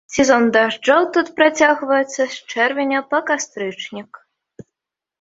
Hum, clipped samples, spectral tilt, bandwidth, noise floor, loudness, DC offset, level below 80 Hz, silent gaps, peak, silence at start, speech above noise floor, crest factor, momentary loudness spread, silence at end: none; under 0.1%; -3 dB/octave; 8 kHz; -84 dBFS; -17 LUFS; under 0.1%; -56 dBFS; none; -2 dBFS; 0.1 s; 66 dB; 16 dB; 12 LU; 1.2 s